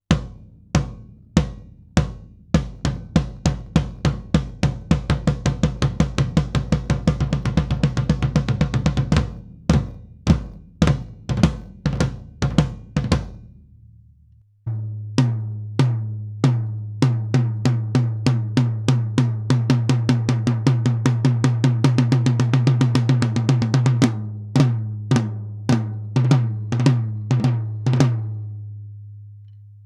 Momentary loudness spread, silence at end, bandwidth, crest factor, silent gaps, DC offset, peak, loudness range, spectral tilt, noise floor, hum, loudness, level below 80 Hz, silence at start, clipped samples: 10 LU; 0.1 s; 10.5 kHz; 20 dB; none; under 0.1%; 0 dBFS; 6 LU; -7 dB/octave; -53 dBFS; none; -21 LUFS; -32 dBFS; 0.1 s; under 0.1%